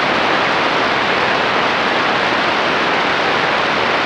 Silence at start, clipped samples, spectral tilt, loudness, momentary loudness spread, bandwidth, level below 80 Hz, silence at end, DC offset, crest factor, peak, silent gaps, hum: 0 s; under 0.1%; -3.5 dB/octave; -14 LUFS; 1 LU; 13.5 kHz; -50 dBFS; 0 s; under 0.1%; 14 dB; -2 dBFS; none; none